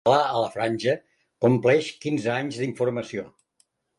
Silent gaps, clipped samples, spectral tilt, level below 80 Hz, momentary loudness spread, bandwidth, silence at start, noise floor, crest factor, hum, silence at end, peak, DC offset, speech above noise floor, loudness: none; under 0.1%; -6 dB/octave; -66 dBFS; 11 LU; 11.5 kHz; 0.05 s; -68 dBFS; 20 dB; none; 0.7 s; -6 dBFS; under 0.1%; 45 dB; -24 LUFS